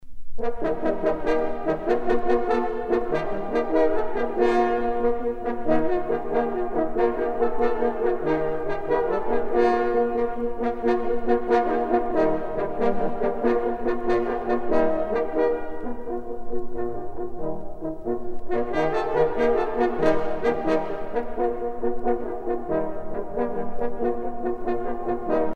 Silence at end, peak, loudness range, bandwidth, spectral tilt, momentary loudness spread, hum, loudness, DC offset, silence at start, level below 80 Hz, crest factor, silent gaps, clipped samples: 0 s; -6 dBFS; 5 LU; 6.4 kHz; -7.5 dB/octave; 9 LU; none; -25 LUFS; under 0.1%; 0 s; -40 dBFS; 18 dB; none; under 0.1%